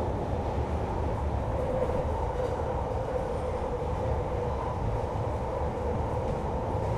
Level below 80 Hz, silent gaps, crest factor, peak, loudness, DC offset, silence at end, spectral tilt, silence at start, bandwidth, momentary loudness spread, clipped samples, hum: -36 dBFS; none; 14 dB; -16 dBFS; -31 LUFS; under 0.1%; 0 s; -8 dB/octave; 0 s; 11.5 kHz; 2 LU; under 0.1%; none